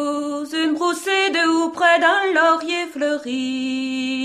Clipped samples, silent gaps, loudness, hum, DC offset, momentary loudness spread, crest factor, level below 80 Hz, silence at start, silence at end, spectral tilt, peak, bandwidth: under 0.1%; none; -19 LUFS; none; under 0.1%; 8 LU; 16 dB; -68 dBFS; 0 s; 0 s; -2 dB/octave; -4 dBFS; 14.5 kHz